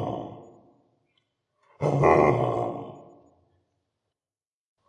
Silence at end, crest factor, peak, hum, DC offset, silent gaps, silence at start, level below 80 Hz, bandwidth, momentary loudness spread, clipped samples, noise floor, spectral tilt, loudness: 1.9 s; 24 dB; -4 dBFS; none; under 0.1%; none; 0 s; -56 dBFS; 9.8 kHz; 21 LU; under 0.1%; under -90 dBFS; -8.5 dB/octave; -24 LUFS